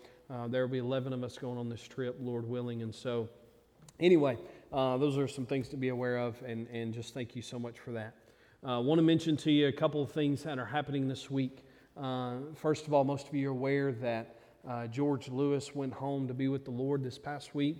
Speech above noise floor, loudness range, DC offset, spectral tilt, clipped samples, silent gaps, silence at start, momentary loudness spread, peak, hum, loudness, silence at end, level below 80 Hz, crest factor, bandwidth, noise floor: 27 dB; 6 LU; under 0.1%; -7 dB/octave; under 0.1%; none; 0 s; 14 LU; -14 dBFS; none; -34 LUFS; 0 s; -70 dBFS; 20 dB; 12.5 kHz; -60 dBFS